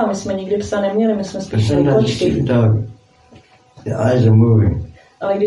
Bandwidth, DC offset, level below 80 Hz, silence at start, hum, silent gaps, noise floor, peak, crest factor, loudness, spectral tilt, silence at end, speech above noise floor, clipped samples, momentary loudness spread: 10.5 kHz; under 0.1%; -42 dBFS; 0 s; none; none; -47 dBFS; -2 dBFS; 14 dB; -16 LUFS; -7.5 dB/octave; 0 s; 32 dB; under 0.1%; 14 LU